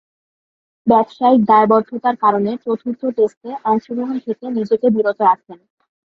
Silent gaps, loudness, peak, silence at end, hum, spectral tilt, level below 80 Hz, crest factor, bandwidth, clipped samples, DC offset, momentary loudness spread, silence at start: 3.37-3.41 s; -17 LUFS; 0 dBFS; 0.55 s; none; -8.5 dB/octave; -62 dBFS; 16 dB; 6.2 kHz; under 0.1%; under 0.1%; 11 LU; 0.85 s